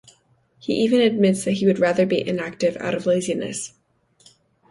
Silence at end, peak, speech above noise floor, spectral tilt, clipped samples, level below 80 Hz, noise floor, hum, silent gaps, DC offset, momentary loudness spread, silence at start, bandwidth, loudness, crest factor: 1 s; -6 dBFS; 40 dB; -5.5 dB/octave; under 0.1%; -62 dBFS; -60 dBFS; none; none; under 0.1%; 11 LU; 0.65 s; 11.5 kHz; -21 LUFS; 16 dB